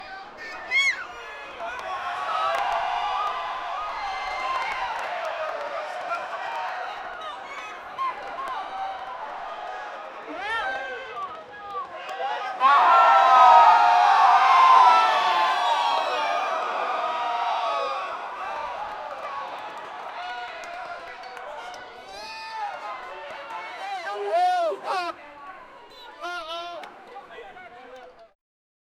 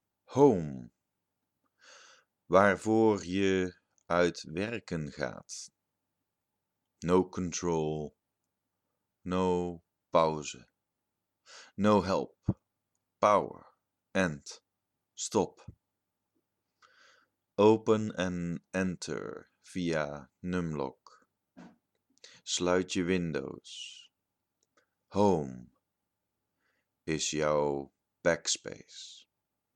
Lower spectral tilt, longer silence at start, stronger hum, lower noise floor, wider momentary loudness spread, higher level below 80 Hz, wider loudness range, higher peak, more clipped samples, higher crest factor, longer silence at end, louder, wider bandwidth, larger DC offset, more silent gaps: second, -1 dB/octave vs -5 dB/octave; second, 0 s vs 0.3 s; neither; second, -46 dBFS vs -86 dBFS; first, 22 LU vs 19 LU; about the same, -64 dBFS vs -62 dBFS; first, 19 LU vs 7 LU; first, -4 dBFS vs -8 dBFS; neither; about the same, 20 dB vs 24 dB; first, 0.75 s vs 0.6 s; first, -22 LUFS vs -31 LUFS; first, 13 kHz vs 11 kHz; neither; neither